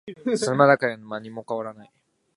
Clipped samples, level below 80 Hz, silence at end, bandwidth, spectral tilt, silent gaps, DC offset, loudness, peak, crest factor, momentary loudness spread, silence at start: under 0.1%; -72 dBFS; 0.55 s; 11.5 kHz; -5.5 dB/octave; none; under 0.1%; -22 LUFS; -2 dBFS; 22 dB; 17 LU; 0.05 s